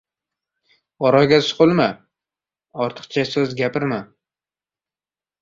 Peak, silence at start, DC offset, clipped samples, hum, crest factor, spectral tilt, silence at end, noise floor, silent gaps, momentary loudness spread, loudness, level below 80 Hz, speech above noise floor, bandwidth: -2 dBFS; 1 s; under 0.1%; under 0.1%; none; 20 dB; -6 dB/octave; 1.4 s; under -90 dBFS; none; 12 LU; -19 LUFS; -58 dBFS; over 72 dB; 7.6 kHz